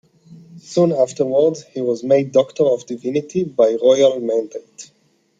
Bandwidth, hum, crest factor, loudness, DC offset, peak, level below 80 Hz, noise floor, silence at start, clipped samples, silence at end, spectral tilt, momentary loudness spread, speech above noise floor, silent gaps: 7.8 kHz; none; 16 dB; -17 LUFS; under 0.1%; -2 dBFS; -66 dBFS; -44 dBFS; 0.3 s; under 0.1%; 0.55 s; -6 dB/octave; 9 LU; 27 dB; none